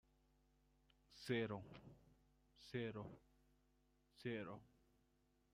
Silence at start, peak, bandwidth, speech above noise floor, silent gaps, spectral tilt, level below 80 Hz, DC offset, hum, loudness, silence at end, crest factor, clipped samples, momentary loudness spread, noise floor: 1.1 s; -30 dBFS; 13 kHz; 33 dB; none; -6.5 dB/octave; -78 dBFS; under 0.1%; none; -49 LUFS; 0.9 s; 22 dB; under 0.1%; 22 LU; -81 dBFS